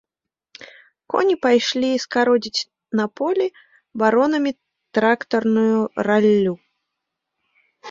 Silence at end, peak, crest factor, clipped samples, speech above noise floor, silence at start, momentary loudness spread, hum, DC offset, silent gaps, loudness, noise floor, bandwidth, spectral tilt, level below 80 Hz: 0 s; -2 dBFS; 18 dB; under 0.1%; 67 dB; 0.6 s; 9 LU; none; under 0.1%; none; -19 LUFS; -86 dBFS; 7.6 kHz; -5 dB/octave; -66 dBFS